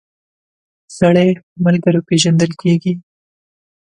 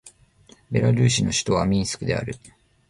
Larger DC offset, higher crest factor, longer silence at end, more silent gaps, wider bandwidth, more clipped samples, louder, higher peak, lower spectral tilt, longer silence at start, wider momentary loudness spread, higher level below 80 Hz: neither; about the same, 16 dB vs 16 dB; first, 0.95 s vs 0.4 s; first, 1.43-1.56 s vs none; second, 10 kHz vs 11.5 kHz; neither; first, -14 LUFS vs -22 LUFS; first, 0 dBFS vs -8 dBFS; about the same, -6 dB/octave vs -5 dB/octave; first, 0.9 s vs 0.05 s; second, 6 LU vs 10 LU; second, -54 dBFS vs -44 dBFS